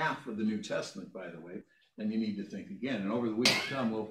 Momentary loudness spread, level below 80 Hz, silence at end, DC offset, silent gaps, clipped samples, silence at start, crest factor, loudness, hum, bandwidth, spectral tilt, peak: 18 LU; -76 dBFS; 0 s; under 0.1%; none; under 0.1%; 0 s; 22 dB; -33 LUFS; none; 15.5 kHz; -4 dB/octave; -12 dBFS